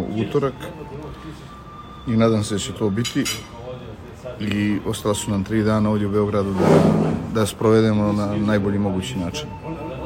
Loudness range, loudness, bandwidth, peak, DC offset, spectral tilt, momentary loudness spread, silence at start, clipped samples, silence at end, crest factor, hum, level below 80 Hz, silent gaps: 5 LU; -21 LUFS; 16 kHz; -2 dBFS; under 0.1%; -6 dB/octave; 19 LU; 0 s; under 0.1%; 0 s; 18 dB; none; -44 dBFS; none